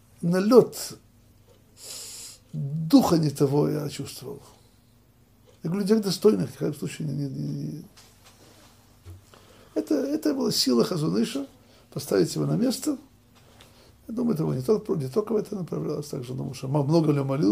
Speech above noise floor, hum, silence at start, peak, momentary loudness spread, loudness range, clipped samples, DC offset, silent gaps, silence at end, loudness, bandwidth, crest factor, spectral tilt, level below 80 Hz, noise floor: 34 dB; none; 0.2 s; -4 dBFS; 16 LU; 4 LU; under 0.1%; under 0.1%; none; 0 s; -25 LUFS; 16 kHz; 24 dB; -6 dB/octave; -62 dBFS; -58 dBFS